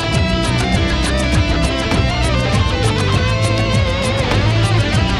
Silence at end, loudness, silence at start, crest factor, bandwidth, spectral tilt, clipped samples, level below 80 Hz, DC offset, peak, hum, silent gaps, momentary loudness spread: 0 s; -16 LUFS; 0 s; 12 dB; 12 kHz; -5.5 dB/octave; under 0.1%; -22 dBFS; under 0.1%; -2 dBFS; none; none; 2 LU